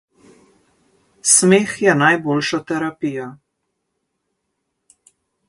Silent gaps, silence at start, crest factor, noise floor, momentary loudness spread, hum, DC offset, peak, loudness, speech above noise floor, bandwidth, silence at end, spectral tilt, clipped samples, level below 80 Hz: none; 1.25 s; 20 dB; -74 dBFS; 14 LU; none; under 0.1%; 0 dBFS; -16 LUFS; 58 dB; 12 kHz; 2.15 s; -3.5 dB/octave; under 0.1%; -64 dBFS